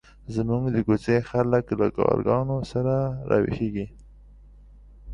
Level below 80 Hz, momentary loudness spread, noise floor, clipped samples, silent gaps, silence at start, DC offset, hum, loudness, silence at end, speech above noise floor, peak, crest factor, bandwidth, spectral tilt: -46 dBFS; 7 LU; -48 dBFS; under 0.1%; none; 0.25 s; under 0.1%; 50 Hz at -45 dBFS; -24 LUFS; 0 s; 25 dB; -6 dBFS; 20 dB; 10 kHz; -9 dB/octave